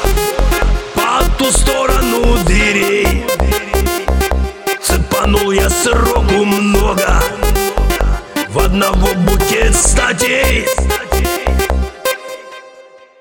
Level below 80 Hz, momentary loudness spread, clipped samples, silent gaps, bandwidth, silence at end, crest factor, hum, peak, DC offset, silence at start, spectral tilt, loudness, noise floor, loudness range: -16 dBFS; 6 LU; under 0.1%; none; 17.5 kHz; 0.4 s; 12 dB; none; 0 dBFS; under 0.1%; 0 s; -4 dB/octave; -13 LUFS; -40 dBFS; 1 LU